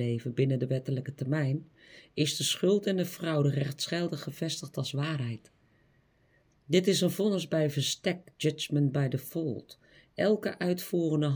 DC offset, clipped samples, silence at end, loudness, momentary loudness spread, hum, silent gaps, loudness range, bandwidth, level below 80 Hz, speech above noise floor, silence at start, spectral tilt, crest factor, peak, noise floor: under 0.1%; under 0.1%; 0 s; -30 LUFS; 8 LU; none; none; 4 LU; over 20 kHz; -72 dBFS; 37 dB; 0 s; -5.5 dB/octave; 20 dB; -10 dBFS; -67 dBFS